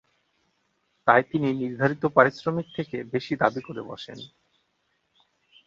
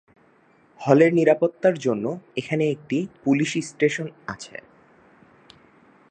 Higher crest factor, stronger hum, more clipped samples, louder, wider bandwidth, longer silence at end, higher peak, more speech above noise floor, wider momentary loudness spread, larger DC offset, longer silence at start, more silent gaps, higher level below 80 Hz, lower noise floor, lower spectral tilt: about the same, 24 dB vs 22 dB; neither; neither; about the same, -24 LUFS vs -22 LUFS; second, 7.4 kHz vs 9.4 kHz; about the same, 1.4 s vs 1.5 s; about the same, -2 dBFS vs -2 dBFS; first, 48 dB vs 36 dB; about the same, 18 LU vs 18 LU; neither; first, 1.05 s vs 0.8 s; neither; about the same, -66 dBFS vs -68 dBFS; first, -73 dBFS vs -58 dBFS; first, -7.5 dB/octave vs -6 dB/octave